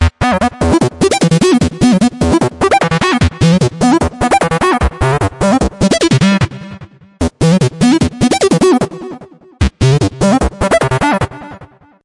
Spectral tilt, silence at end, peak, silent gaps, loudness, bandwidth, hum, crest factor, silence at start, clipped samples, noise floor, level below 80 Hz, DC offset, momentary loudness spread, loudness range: -5.5 dB/octave; 0.4 s; 0 dBFS; none; -12 LUFS; 11.5 kHz; none; 12 dB; 0 s; under 0.1%; -38 dBFS; -26 dBFS; under 0.1%; 9 LU; 2 LU